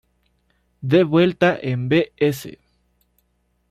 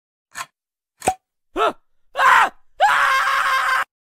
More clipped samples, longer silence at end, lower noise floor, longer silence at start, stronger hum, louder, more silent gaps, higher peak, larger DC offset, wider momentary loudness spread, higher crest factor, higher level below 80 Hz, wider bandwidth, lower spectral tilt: neither; first, 1.2 s vs 0.35 s; second, -67 dBFS vs -77 dBFS; first, 0.85 s vs 0.35 s; first, 60 Hz at -45 dBFS vs none; about the same, -19 LUFS vs -18 LUFS; neither; about the same, -4 dBFS vs -2 dBFS; neither; second, 16 LU vs 20 LU; about the same, 18 dB vs 18 dB; about the same, -56 dBFS vs -54 dBFS; about the same, 15.5 kHz vs 16 kHz; first, -7 dB/octave vs -1 dB/octave